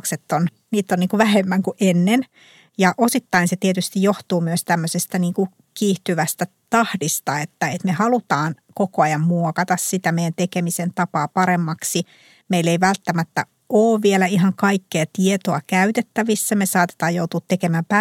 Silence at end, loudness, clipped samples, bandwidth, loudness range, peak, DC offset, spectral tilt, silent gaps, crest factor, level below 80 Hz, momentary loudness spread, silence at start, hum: 0 s; -20 LUFS; under 0.1%; 16.5 kHz; 3 LU; -2 dBFS; under 0.1%; -5 dB/octave; none; 18 dB; -68 dBFS; 7 LU; 0.05 s; none